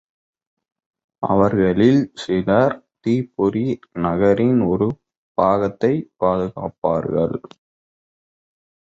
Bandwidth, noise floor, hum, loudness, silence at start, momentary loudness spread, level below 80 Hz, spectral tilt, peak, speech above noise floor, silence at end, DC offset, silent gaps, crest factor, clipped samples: 8 kHz; under -90 dBFS; none; -19 LUFS; 1.2 s; 9 LU; -48 dBFS; -8.5 dB/octave; -2 dBFS; over 72 dB; 1.55 s; under 0.1%; 5.17-5.35 s, 6.78-6.82 s; 18 dB; under 0.1%